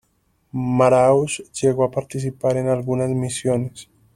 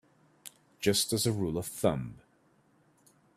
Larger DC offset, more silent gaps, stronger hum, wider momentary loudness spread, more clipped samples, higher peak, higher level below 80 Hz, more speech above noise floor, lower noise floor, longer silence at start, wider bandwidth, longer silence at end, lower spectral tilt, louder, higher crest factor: neither; neither; neither; second, 11 LU vs 23 LU; neither; first, -2 dBFS vs -12 dBFS; first, -52 dBFS vs -60 dBFS; first, 46 dB vs 37 dB; about the same, -65 dBFS vs -67 dBFS; about the same, 0.55 s vs 0.45 s; second, 13 kHz vs 16 kHz; second, 0.3 s vs 1.2 s; first, -6 dB/octave vs -4 dB/octave; first, -20 LUFS vs -30 LUFS; about the same, 18 dB vs 22 dB